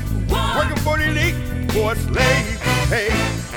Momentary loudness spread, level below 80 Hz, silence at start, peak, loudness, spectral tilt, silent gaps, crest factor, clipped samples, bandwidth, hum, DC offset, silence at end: 4 LU; -26 dBFS; 0 s; -2 dBFS; -19 LUFS; -5 dB/octave; none; 18 dB; under 0.1%; over 20 kHz; none; under 0.1%; 0 s